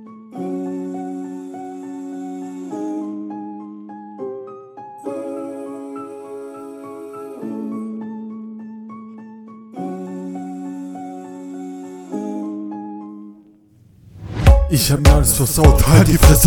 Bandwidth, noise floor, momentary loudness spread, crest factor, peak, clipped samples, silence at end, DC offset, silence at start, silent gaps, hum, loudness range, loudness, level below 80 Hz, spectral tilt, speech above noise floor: 19 kHz; -50 dBFS; 23 LU; 20 dB; 0 dBFS; under 0.1%; 0 s; under 0.1%; 0 s; none; none; 15 LU; -19 LUFS; -24 dBFS; -5.5 dB/octave; 40 dB